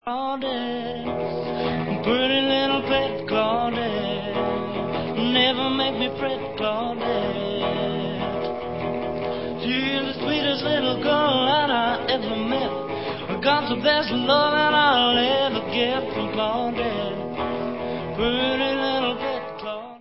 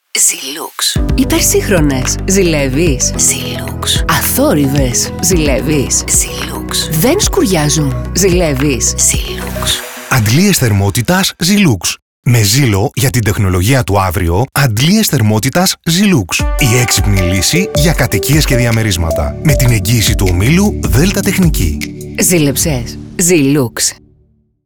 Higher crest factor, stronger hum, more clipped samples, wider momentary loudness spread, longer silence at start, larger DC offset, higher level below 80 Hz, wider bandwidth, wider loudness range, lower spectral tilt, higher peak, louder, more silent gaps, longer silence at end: first, 18 dB vs 12 dB; neither; neither; first, 9 LU vs 6 LU; about the same, 0.05 s vs 0.15 s; first, 0.4% vs under 0.1%; second, -50 dBFS vs -22 dBFS; second, 5.8 kHz vs over 20 kHz; first, 5 LU vs 1 LU; first, -9 dB/octave vs -4 dB/octave; second, -6 dBFS vs 0 dBFS; second, -23 LUFS vs -11 LUFS; second, none vs 12.02-12.23 s; second, 0 s vs 0.7 s